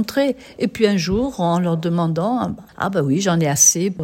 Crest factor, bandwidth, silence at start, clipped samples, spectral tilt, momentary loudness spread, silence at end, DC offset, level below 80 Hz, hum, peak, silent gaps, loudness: 18 dB; 16.5 kHz; 0 s; under 0.1%; -4.5 dB/octave; 11 LU; 0 s; under 0.1%; -46 dBFS; none; 0 dBFS; none; -18 LUFS